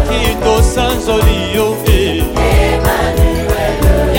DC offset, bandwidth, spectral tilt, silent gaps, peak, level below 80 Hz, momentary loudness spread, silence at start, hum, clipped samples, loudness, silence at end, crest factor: under 0.1%; 17 kHz; -5.5 dB/octave; none; 0 dBFS; -16 dBFS; 3 LU; 0 s; none; under 0.1%; -13 LUFS; 0 s; 10 dB